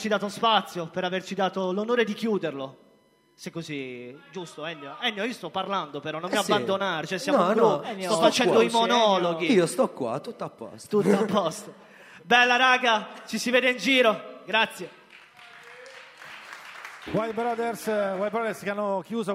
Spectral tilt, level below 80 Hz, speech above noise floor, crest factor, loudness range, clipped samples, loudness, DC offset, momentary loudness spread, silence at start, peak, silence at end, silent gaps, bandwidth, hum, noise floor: -4 dB/octave; -72 dBFS; 36 dB; 22 dB; 10 LU; under 0.1%; -24 LUFS; under 0.1%; 20 LU; 0 s; -4 dBFS; 0 s; none; 16 kHz; none; -62 dBFS